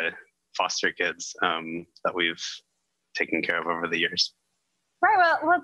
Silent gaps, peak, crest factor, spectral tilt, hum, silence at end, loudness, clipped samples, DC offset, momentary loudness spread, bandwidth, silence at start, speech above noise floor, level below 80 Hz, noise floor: none; -8 dBFS; 18 dB; -2 dB/octave; none; 0 s; -25 LUFS; under 0.1%; under 0.1%; 14 LU; 11 kHz; 0 s; 51 dB; -74 dBFS; -77 dBFS